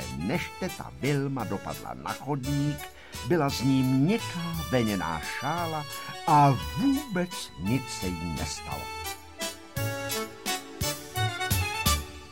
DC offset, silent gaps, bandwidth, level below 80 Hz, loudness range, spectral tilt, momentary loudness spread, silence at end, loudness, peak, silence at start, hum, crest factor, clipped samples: 0.2%; none; 17 kHz; -44 dBFS; 6 LU; -5 dB/octave; 11 LU; 0 s; -29 LUFS; -10 dBFS; 0 s; none; 18 dB; under 0.1%